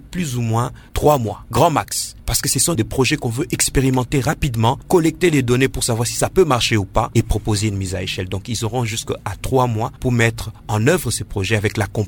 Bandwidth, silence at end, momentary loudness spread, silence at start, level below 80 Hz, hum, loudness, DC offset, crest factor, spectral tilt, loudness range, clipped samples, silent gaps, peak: 18 kHz; 0 s; 7 LU; 0.05 s; -34 dBFS; none; -18 LUFS; under 0.1%; 16 dB; -4.5 dB/octave; 3 LU; under 0.1%; none; -2 dBFS